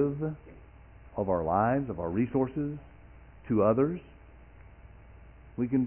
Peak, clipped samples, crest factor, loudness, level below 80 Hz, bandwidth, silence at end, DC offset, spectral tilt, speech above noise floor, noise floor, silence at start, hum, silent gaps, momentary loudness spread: -12 dBFS; under 0.1%; 18 dB; -30 LUFS; -52 dBFS; 3.2 kHz; 0 s; under 0.1%; -9.5 dB/octave; 24 dB; -52 dBFS; 0 s; none; none; 17 LU